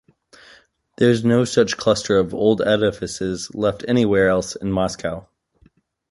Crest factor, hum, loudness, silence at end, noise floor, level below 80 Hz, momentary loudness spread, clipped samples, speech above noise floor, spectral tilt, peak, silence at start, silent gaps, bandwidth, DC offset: 18 dB; none; -19 LUFS; 0.9 s; -57 dBFS; -48 dBFS; 9 LU; under 0.1%; 39 dB; -5.5 dB/octave; -2 dBFS; 1 s; none; 11.5 kHz; under 0.1%